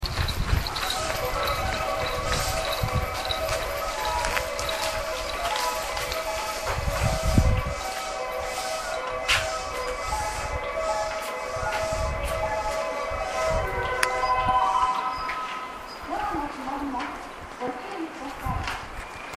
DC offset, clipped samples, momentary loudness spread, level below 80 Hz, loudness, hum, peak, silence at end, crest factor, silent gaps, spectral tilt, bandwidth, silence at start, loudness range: under 0.1%; under 0.1%; 9 LU; -36 dBFS; -27 LUFS; none; 0 dBFS; 0 s; 28 dB; none; -3.5 dB/octave; 15.5 kHz; 0 s; 4 LU